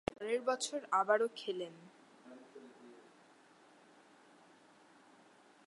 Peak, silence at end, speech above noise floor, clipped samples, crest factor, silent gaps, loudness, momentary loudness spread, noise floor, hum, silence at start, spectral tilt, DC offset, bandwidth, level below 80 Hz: -18 dBFS; 2.65 s; 29 dB; under 0.1%; 24 dB; none; -36 LUFS; 26 LU; -64 dBFS; none; 0.1 s; -2.5 dB/octave; under 0.1%; 11.5 kHz; -74 dBFS